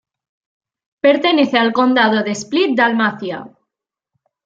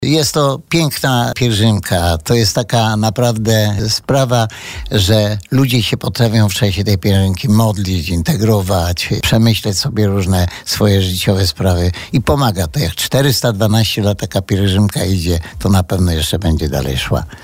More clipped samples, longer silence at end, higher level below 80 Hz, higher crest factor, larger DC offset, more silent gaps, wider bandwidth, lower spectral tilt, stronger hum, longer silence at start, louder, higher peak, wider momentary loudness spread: neither; first, 1 s vs 0 s; second, -66 dBFS vs -30 dBFS; about the same, 16 dB vs 12 dB; neither; neither; second, 8 kHz vs 16.5 kHz; about the same, -4.5 dB/octave vs -5 dB/octave; neither; first, 1.05 s vs 0 s; about the same, -15 LUFS vs -14 LUFS; about the same, -2 dBFS vs -2 dBFS; first, 9 LU vs 4 LU